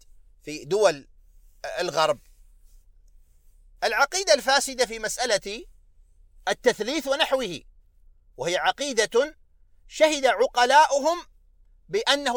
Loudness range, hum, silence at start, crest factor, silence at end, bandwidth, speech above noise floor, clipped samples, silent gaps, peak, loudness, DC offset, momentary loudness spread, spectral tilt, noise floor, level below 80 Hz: 6 LU; none; 0.45 s; 20 dB; 0 s; over 20 kHz; 33 dB; under 0.1%; none; -4 dBFS; -23 LUFS; under 0.1%; 16 LU; -1.5 dB/octave; -56 dBFS; -54 dBFS